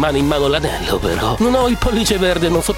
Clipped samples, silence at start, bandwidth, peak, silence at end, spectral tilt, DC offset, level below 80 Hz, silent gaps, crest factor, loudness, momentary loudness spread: under 0.1%; 0 s; 16.5 kHz; -2 dBFS; 0 s; -4.5 dB/octave; under 0.1%; -28 dBFS; none; 14 dB; -16 LUFS; 3 LU